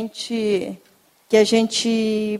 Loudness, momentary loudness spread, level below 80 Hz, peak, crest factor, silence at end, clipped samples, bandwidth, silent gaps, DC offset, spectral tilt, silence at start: -19 LUFS; 12 LU; -64 dBFS; -4 dBFS; 16 dB; 0 s; under 0.1%; 14 kHz; none; under 0.1%; -4 dB/octave; 0 s